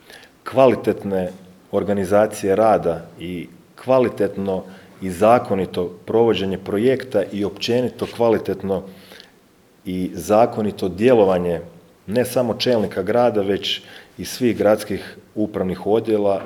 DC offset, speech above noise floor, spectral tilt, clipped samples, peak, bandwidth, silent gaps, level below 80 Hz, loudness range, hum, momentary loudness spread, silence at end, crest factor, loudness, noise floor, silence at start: under 0.1%; 34 dB; -6 dB/octave; under 0.1%; 0 dBFS; 19 kHz; none; -56 dBFS; 3 LU; none; 14 LU; 0 s; 18 dB; -20 LUFS; -53 dBFS; 0.1 s